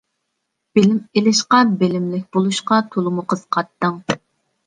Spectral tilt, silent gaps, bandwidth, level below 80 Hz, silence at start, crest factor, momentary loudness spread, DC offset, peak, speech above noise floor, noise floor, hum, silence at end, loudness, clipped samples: -5 dB/octave; none; 9.8 kHz; -60 dBFS; 0.75 s; 18 dB; 9 LU; under 0.1%; -2 dBFS; 58 dB; -75 dBFS; none; 0.5 s; -18 LUFS; under 0.1%